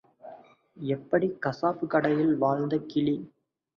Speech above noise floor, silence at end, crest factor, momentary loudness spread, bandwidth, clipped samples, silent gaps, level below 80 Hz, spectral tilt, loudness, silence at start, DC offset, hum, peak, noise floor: 25 dB; 0.5 s; 18 dB; 14 LU; 6.4 kHz; under 0.1%; none; -68 dBFS; -8.5 dB/octave; -28 LUFS; 0.25 s; under 0.1%; none; -10 dBFS; -51 dBFS